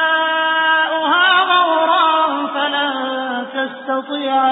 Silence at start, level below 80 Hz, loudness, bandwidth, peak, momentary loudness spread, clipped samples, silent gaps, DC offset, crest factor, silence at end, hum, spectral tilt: 0 s; -72 dBFS; -15 LUFS; 4 kHz; -2 dBFS; 10 LU; under 0.1%; none; under 0.1%; 14 dB; 0 s; none; -7 dB/octave